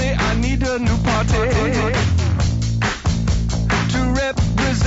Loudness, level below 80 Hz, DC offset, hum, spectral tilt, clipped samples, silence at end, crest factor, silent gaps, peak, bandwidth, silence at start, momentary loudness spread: -19 LUFS; -24 dBFS; under 0.1%; none; -5.5 dB/octave; under 0.1%; 0 s; 10 dB; none; -8 dBFS; 8 kHz; 0 s; 2 LU